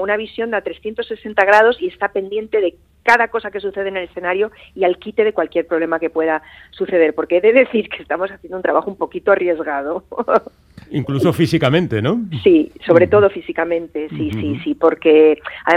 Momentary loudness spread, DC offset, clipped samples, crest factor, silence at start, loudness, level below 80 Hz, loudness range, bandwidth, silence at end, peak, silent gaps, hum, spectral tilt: 11 LU; under 0.1%; under 0.1%; 16 dB; 0 s; -17 LUFS; -52 dBFS; 4 LU; 13.5 kHz; 0 s; 0 dBFS; none; none; -7 dB/octave